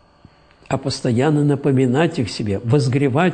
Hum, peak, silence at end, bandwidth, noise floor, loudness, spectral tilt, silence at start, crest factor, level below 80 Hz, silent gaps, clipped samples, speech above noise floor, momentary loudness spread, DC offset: none; -2 dBFS; 0 s; 9.4 kHz; -50 dBFS; -18 LUFS; -7 dB/octave; 0.7 s; 16 dB; -52 dBFS; none; under 0.1%; 33 dB; 7 LU; under 0.1%